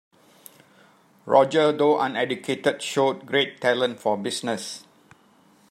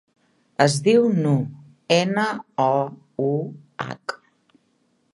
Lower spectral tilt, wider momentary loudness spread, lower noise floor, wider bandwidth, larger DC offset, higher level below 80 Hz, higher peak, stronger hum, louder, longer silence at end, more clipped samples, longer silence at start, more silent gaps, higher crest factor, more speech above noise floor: second, -4 dB/octave vs -5.5 dB/octave; second, 9 LU vs 16 LU; second, -58 dBFS vs -66 dBFS; first, 16 kHz vs 11.5 kHz; neither; second, -74 dBFS vs -68 dBFS; about the same, -4 dBFS vs -2 dBFS; neither; about the same, -23 LUFS vs -21 LUFS; about the same, 0.9 s vs 1 s; neither; first, 1.25 s vs 0.6 s; neither; about the same, 22 dB vs 22 dB; second, 35 dB vs 45 dB